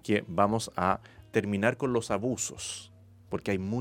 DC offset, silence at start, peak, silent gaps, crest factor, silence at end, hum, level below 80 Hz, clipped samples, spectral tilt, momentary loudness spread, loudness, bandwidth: under 0.1%; 0.05 s; -8 dBFS; none; 22 dB; 0 s; none; -58 dBFS; under 0.1%; -5 dB/octave; 10 LU; -30 LUFS; 16.5 kHz